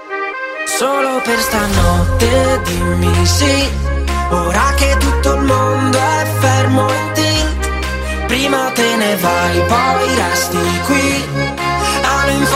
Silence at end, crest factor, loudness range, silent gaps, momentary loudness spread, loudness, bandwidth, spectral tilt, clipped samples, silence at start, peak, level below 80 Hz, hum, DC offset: 0 s; 14 dB; 1 LU; none; 5 LU; -14 LUFS; 16 kHz; -4.5 dB/octave; under 0.1%; 0 s; 0 dBFS; -22 dBFS; none; under 0.1%